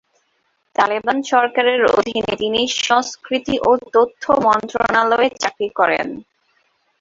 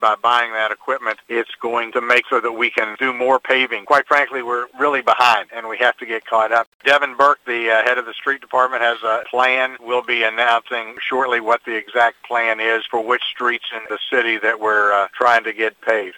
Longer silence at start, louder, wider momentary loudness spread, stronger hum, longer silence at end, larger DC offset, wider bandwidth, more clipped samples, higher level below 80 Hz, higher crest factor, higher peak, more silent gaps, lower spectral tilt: first, 0.8 s vs 0 s; about the same, -17 LUFS vs -17 LUFS; about the same, 7 LU vs 7 LU; neither; first, 0.8 s vs 0 s; neither; second, 7.8 kHz vs 18 kHz; neither; first, -52 dBFS vs -70 dBFS; about the same, 16 dB vs 18 dB; about the same, -2 dBFS vs 0 dBFS; second, none vs 6.67-6.80 s; about the same, -3 dB/octave vs -2.5 dB/octave